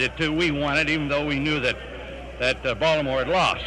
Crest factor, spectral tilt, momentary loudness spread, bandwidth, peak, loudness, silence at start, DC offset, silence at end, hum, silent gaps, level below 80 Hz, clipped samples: 16 dB; -5 dB/octave; 10 LU; 11.5 kHz; -8 dBFS; -23 LUFS; 0 s; under 0.1%; 0 s; none; none; -40 dBFS; under 0.1%